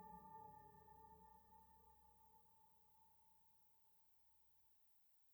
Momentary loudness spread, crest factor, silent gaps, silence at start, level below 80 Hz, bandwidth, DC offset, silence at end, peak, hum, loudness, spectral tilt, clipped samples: 8 LU; 18 dB; none; 0 s; -84 dBFS; over 20 kHz; under 0.1%; 0 s; -50 dBFS; none; -65 LUFS; -6 dB/octave; under 0.1%